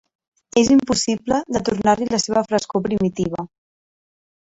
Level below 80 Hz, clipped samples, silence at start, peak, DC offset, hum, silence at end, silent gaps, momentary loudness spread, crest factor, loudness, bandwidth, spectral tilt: -48 dBFS; under 0.1%; 0.55 s; -4 dBFS; under 0.1%; none; 1.05 s; none; 9 LU; 16 dB; -19 LUFS; 8.2 kHz; -4.5 dB/octave